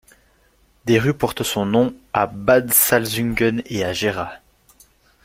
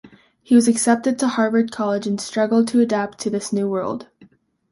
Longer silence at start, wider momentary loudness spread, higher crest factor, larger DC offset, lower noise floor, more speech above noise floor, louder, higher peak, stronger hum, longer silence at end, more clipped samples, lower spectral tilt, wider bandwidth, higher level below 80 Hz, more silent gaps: first, 0.85 s vs 0.05 s; about the same, 10 LU vs 9 LU; about the same, 20 dB vs 16 dB; neither; first, -58 dBFS vs -53 dBFS; first, 39 dB vs 34 dB; about the same, -19 LUFS vs -19 LUFS; first, 0 dBFS vs -4 dBFS; neither; first, 0.9 s vs 0.7 s; neither; about the same, -4 dB/octave vs -4.5 dB/octave; first, 16.5 kHz vs 11.5 kHz; first, -48 dBFS vs -62 dBFS; neither